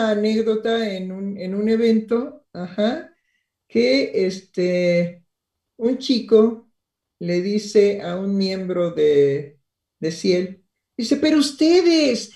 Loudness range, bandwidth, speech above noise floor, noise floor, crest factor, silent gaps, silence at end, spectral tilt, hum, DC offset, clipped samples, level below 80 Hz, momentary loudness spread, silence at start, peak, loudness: 3 LU; 12 kHz; 60 dB; -79 dBFS; 16 dB; none; 0.1 s; -5.5 dB/octave; none; under 0.1%; under 0.1%; -64 dBFS; 13 LU; 0 s; -4 dBFS; -20 LUFS